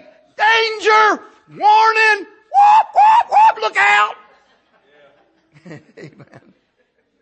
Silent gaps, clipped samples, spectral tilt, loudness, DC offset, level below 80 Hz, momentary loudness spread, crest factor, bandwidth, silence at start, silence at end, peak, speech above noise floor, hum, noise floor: none; under 0.1%; -1.5 dB/octave; -13 LUFS; under 0.1%; -70 dBFS; 7 LU; 14 dB; 8.8 kHz; 0.4 s; 1.15 s; -2 dBFS; 50 dB; none; -63 dBFS